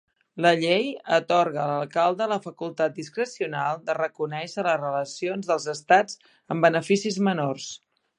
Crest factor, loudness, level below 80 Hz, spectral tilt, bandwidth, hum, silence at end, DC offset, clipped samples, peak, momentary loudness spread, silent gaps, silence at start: 20 dB; -25 LUFS; -78 dBFS; -5 dB/octave; 11 kHz; none; 0.4 s; under 0.1%; under 0.1%; -4 dBFS; 11 LU; none; 0.35 s